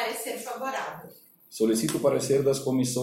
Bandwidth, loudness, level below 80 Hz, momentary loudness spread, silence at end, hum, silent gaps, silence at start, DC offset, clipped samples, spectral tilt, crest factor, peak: 16.5 kHz; -27 LUFS; -66 dBFS; 12 LU; 0 s; none; none; 0 s; under 0.1%; under 0.1%; -4.5 dB/octave; 16 dB; -12 dBFS